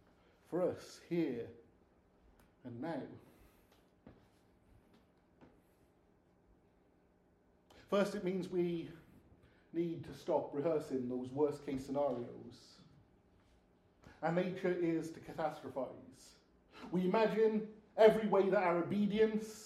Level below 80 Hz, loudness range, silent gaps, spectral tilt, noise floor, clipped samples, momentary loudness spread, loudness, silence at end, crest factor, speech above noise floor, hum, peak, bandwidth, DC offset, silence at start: -72 dBFS; 18 LU; none; -7 dB/octave; -71 dBFS; under 0.1%; 15 LU; -37 LUFS; 0 s; 24 dB; 35 dB; none; -14 dBFS; 14 kHz; under 0.1%; 0.5 s